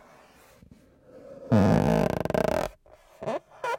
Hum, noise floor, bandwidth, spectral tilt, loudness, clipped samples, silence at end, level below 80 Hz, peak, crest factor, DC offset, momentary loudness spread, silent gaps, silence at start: none; -55 dBFS; 17 kHz; -7.5 dB/octave; -26 LUFS; under 0.1%; 0 s; -48 dBFS; -10 dBFS; 18 dB; under 0.1%; 16 LU; none; 1.15 s